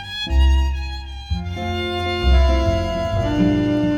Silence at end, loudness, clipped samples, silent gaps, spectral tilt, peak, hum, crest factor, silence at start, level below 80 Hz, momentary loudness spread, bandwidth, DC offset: 0 s; -20 LUFS; under 0.1%; none; -7 dB/octave; -4 dBFS; none; 14 dB; 0 s; -20 dBFS; 11 LU; 7.4 kHz; under 0.1%